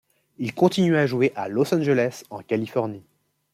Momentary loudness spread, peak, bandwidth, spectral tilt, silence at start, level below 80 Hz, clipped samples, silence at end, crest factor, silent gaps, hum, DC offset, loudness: 12 LU; -4 dBFS; 15.5 kHz; -6.5 dB/octave; 0.4 s; -66 dBFS; under 0.1%; 0.55 s; 18 dB; none; none; under 0.1%; -23 LUFS